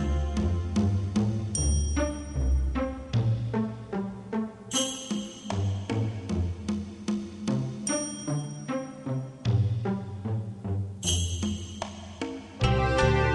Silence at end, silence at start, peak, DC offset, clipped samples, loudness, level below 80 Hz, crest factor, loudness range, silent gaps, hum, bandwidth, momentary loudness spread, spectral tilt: 0 s; 0 s; -10 dBFS; under 0.1%; under 0.1%; -30 LUFS; -36 dBFS; 18 dB; 3 LU; none; none; 12 kHz; 8 LU; -5 dB/octave